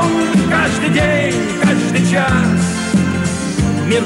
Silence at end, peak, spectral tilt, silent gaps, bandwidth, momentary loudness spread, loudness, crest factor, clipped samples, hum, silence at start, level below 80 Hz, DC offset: 0 s; -2 dBFS; -5.5 dB/octave; none; 12 kHz; 4 LU; -14 LUFS; 12 dB; under 0.1%; none; 0 s; -34 dBFS; under 0.1%